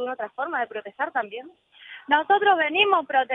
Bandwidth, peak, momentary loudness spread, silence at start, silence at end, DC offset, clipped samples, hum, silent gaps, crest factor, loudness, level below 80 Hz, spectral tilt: 3.9 kHz; -6 dBFS; 17 LU; 0 s; 0 s; under 0.1%; under 0.1%; none; none; 18 dB; -23 LUFS; -74 dBFS; -5.5 dB/octave